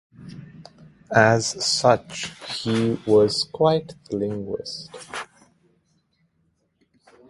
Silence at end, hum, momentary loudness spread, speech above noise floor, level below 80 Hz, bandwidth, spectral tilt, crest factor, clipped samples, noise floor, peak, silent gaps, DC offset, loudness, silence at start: 2.05 s; none; 18 LU; 47 dB; -58 dBFS; 11.5 kHz; -4.5 dB/octave; 24 dB; under 0.1%; -68 dBFS; 0 dBFS; none; under 0.1%; -22 LUFS; 0.2 s